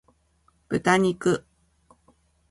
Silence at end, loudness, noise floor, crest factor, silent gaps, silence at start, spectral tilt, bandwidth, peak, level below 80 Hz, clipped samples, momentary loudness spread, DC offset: 1.1 s; -24 LUFS; -65 dBFS; 22 dB; none; 0.7 s; -5.5 dB/octave; 11.5 kHz; -6 dBFS; -58 dBFS; under 0.1%; 9 LU; under 0.1%